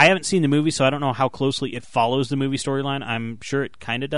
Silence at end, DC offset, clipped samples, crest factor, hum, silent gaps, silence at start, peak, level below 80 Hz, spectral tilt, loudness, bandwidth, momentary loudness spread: 0 s; 0.8%; under 0.1%; 20 dB; none; none; 0 s; -2 dBFS; -56 dBFS; -5 dB/octave; -22 LUFS; 11 kHz; 8 LU